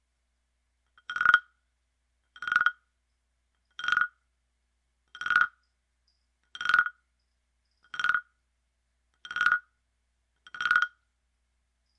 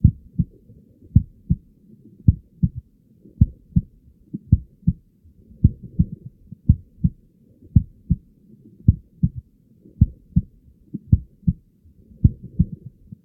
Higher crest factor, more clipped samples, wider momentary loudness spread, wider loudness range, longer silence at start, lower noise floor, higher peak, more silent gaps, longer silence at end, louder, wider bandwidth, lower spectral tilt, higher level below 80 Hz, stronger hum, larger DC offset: first, 28 dB vs 22 dB; neither; about the same, 14 LU vs 16 LU; about the same, 2 LU vs 1 LU; first, 1.1 s vs 0.05 s; first, -77 dBFS vs -53 dBFS; second, -4 dBFS vs 0 dBFS; neither; first, 1.1 s vs 0.5 s; second, -27 LUFS vs -23 LUFS; first, 10 kHz vs 0.7 kHz; second, 0 dB/octave vs -15.5 dB/octave; second, -72 dBFS vs -30 dBFS; first, 60 Hz at -75 dBFS vs none; neither